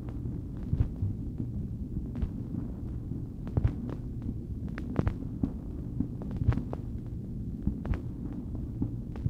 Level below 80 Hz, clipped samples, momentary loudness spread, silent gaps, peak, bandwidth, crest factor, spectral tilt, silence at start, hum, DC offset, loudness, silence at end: -40 dBFS; under 0.1%; 7 LU; none; -12 dBFS; 6 kHz; 20 dB; -10 dB/octave; 0 s; none; under 0.1%; -35 LUFS; 0 s